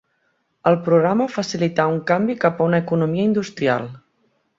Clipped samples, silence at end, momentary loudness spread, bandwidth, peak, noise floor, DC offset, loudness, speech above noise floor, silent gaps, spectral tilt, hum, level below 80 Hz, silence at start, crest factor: under 0.1%; 0.6 s; 6 LU; 7.8 kHz; -2 dBFS; -68 dBFS; under 0.1%; -19 LUFS; 49 dB; none; -7 dB/octave; none; -62 dBFS; 0.65 s; 18 dB